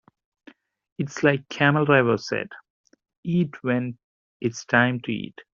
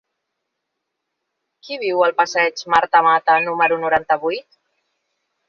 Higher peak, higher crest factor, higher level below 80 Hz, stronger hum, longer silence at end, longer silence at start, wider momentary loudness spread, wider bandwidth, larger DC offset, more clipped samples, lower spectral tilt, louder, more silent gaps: about the same, -4 dBFS vs -2 dBFS; about the same, 22 dB vs 18 dB; about the same, -64 dBFS vs -60 dBFS; neither; second, 0.1 s vs 1.1 s; second, 1 s vs 1.65 s; first, 14 LU vs 11 LU; about the same, 7.4 kHz vs 7.4 kHz; neither; neither; first, -6 dB/octave vs -3.5 dB/octave; second, -23 LUFS vs -17 LUFS; first, 2.70-2.84 s, 3.17-3.23 s, 4.04-4.40 s vs none